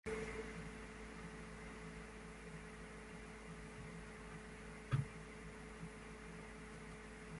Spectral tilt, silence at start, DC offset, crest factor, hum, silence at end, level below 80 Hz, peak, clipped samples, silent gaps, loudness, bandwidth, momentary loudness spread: -5.5 dB/octave; 0.05 s; under 0.1%; 24 dB; none; 0 s; -60 dBFS; -26 dBFS; under 0.1%; none; -51 LUFS; 11.5 kHz; 9 LU